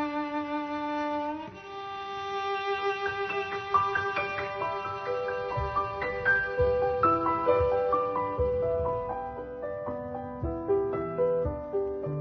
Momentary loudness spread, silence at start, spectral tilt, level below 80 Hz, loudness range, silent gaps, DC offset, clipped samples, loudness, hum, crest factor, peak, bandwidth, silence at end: 10 LU; 0 s; -7 dB/octave; -48 dBFS; 5 LU; none; under 0.1%; under 0.1%; -29 LUFS; none; 18 dB; -12 dBFS; 6.4 kHz; 0 s